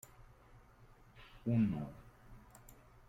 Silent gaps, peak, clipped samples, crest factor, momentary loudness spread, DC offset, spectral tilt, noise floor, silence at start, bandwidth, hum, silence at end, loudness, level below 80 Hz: none; -24 dBFS; under 0.1%; 18 dB; 26 LU; under 0.1%; -8.5 dB/octave; -62 dBFS; 0.2 s; 16 kHz; none; 0.7 s; -37 LUFS; -62 dBFS